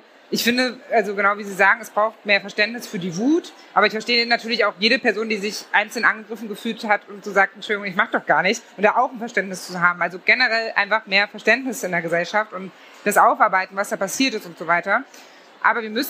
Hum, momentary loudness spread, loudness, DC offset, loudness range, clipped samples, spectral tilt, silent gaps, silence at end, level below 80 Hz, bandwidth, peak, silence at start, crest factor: none; 8 LU; -20 LUFS; under 0.1%; 2 LU; under 0.1%; -3 dB/octave; none; 0 s; -78 dBFS; 15.5 kHz; -2 dBFS; 0.3 s; 18 dB